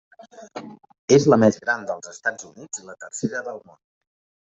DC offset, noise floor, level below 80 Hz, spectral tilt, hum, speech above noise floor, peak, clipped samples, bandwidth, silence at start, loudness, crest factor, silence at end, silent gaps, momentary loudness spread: under 0.1%; -40 dBFS; -64 dBFS; -5 dB/octave; none; 18 dB; -4 dBFS; under 0.1%; 8.2 kHz; 0.2 s; -21 LUFS; 20 dB; 1 s; 0.99-1.08 s; 22 LU